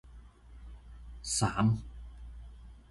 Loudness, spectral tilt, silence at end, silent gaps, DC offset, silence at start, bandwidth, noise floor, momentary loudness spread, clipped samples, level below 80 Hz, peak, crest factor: -31 LUFS; -4.5 dB/octave; 0.1 s; none; under 0.1%; 0.05 s; 11.5 kHz; -53 dBFS; 24 LU; under 0.1%; -48 dBFS; -16 dBFS; 20 dB